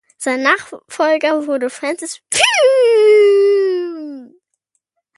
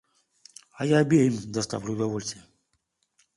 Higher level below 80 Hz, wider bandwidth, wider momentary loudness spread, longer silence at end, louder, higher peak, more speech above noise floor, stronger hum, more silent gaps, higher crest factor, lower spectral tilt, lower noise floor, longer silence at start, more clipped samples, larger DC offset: about the same, -66 dBFS vs -62 dBFS; about the same, 11.5 kHz vs 11.5 kHz; about the same, 15 LU vs 13 LU; about the same, 0.9 s vs 0.95 s; first, -14 LUFS vs -25 LUFS; first, 0 dBFS vs -8 dBFS; about the same, 53 dB vs 50 dB; neither; neither; second, 14 dB vs 20 dB; second, -1 dB/octave vs -6 dB/octave; second, -70 dBFS vs -75 dBFS; second, 0.2 s vs 0.75 s; neither; neither